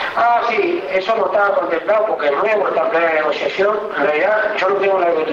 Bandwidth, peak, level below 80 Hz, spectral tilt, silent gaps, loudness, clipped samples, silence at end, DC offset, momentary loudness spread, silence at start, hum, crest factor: 7.4 kHz; -6 dBFS; -60 dBFS; -5 dB/octave; none; -16 LUFS; under 0.1%; 0 s; under 0.1%; 3 LU; 0 s; none; 10 dB